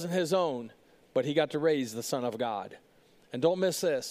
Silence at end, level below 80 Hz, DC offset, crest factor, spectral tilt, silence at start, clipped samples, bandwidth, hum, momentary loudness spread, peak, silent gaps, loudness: 0 s; -76 dBFS; under 0.1%; 18 dB; -4.5 dB/octave; 0 s; under 0.1%; 15.5 kHz; none; 12 LU; -12 dBFS; none; -30 LUFS